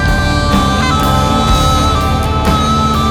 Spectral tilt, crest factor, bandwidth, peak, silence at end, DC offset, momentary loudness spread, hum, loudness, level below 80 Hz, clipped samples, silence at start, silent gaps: -5 dB/octave; 10 dB; 17.5 kHz; 0 dBFS; 0 s; under 0.1%; 2 LU; none; -12 LUFS; -18 dBFS; under 0.1%; 0 s; none